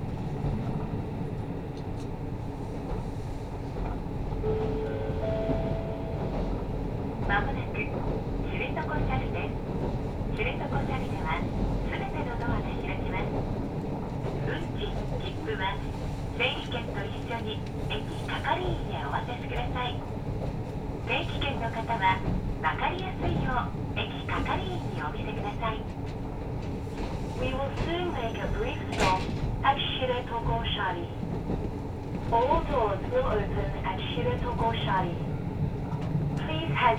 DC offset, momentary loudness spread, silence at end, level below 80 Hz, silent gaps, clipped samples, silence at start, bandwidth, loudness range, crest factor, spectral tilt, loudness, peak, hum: under 0.1%; 7 LU; 0 s; -38 dBFS; none; under 0.1%; 0 s; 14 kHz; 4 LU; 20 dB; -7 dB/octave; -31 LUFS; -10 dBFS; none